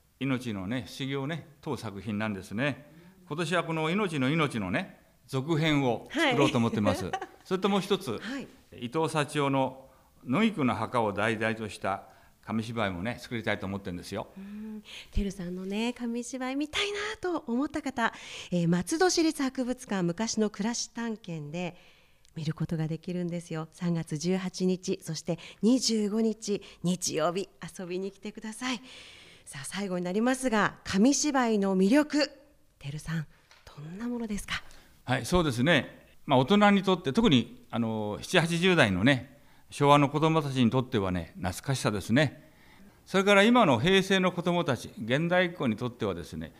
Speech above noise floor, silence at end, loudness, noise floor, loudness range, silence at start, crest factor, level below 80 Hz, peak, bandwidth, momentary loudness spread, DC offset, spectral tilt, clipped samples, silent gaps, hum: 27 dB; 0.1 s; -29 LUFS; -55 dBFS; 9 LU; 0.2 s; 22 dB; -52 dBFS; -6 dBFS; 15.5 kHz; 14 LU; under 0.1%; -5 dB/octave; under 0.1%; none; none